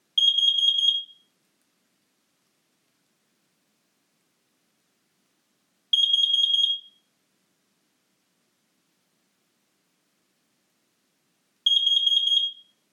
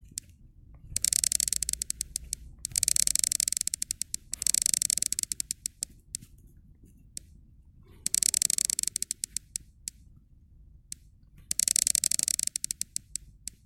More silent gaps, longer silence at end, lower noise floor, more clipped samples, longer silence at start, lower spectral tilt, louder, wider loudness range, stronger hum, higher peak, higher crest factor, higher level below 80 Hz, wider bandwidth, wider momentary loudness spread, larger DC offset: neither; about the same, 0.4 s vs 0.35 s; first, -72 dBFS vs -56 dBFS; neither; second, 0.15 s vs 0.75 s; second, 4 dB/octave vs 1.5 dB/octave; first, -20 LUFS vs -27 LUFS; about the same, 6 LU vs 6 LU; neither; second, -10 dBFS vs -2 dBFS; second, 18 dB vs 30 dB; second, under -90 dBFS vs -54 dBFS; second, 14 kHz vs 17.5 kHz; second, 10 LU vs 18 LU; neither